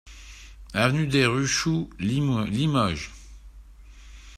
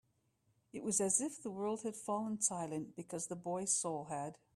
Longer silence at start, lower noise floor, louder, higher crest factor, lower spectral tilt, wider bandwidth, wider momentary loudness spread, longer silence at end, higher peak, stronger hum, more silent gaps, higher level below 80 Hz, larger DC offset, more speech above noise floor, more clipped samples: second, 0.05 s vs 0.75 s; second, -46 dBFS vs -78 dBFS; first, -24 LUFS vs -38 LUFS; about the same, 20 dB vs 22 dB; about the same, -5 dB/octave vs -4 dB/octave; about the same, 14 kHz vs 15 kHz; first, 23 LU vs 11 LU; second, 0 s vs 0.2 s; first, -6 dBFS vs -18 dBFS; neither; neither; first, -46 dBFS vs -80 dBFS; neither; second, 23 dB vs 39 dB; neither